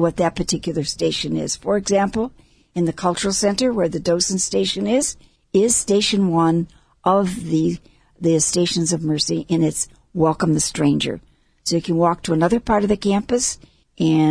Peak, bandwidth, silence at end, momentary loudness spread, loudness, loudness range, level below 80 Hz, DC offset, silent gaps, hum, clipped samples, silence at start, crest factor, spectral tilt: -4 dBFS; 11 kHz; 0 s; 7 LU; -19 LUFS; 2 LU; -46 dBFS; under 0.1%; none; none; under 0.1%; 0 s; 16 dB; -4.5 dB/octave